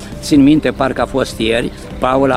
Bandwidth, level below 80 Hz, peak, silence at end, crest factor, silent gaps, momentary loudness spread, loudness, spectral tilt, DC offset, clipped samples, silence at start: 13.5 kHz; -32 dBFS; 0 dBFS; 0 s; 14 dB; none; 8 LU; -14 LUFS; -5.5 dB/octave; under 0.1%; under 0.1%; 0 s